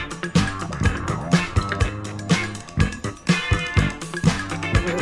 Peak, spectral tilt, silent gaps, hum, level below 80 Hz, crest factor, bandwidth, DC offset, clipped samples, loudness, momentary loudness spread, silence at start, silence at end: -4 dBFS; -5.5 dB/octave; none; none; -32 dBFS; 18 dB; 12 kHz; under 0.1%; under 0.1%; -23 LUFS; 5 LU; 0 s; 0 s